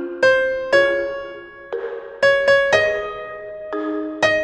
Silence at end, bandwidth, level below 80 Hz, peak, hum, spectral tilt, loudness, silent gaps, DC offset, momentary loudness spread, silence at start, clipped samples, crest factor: 0 s; 9.6 kHz; -52 dBFS; -2 dBFS; none; -3.5 dB/octave; -18 LUFS; none; under 0.1%; 16 LU; 0 s; under 0.1%; 18 dB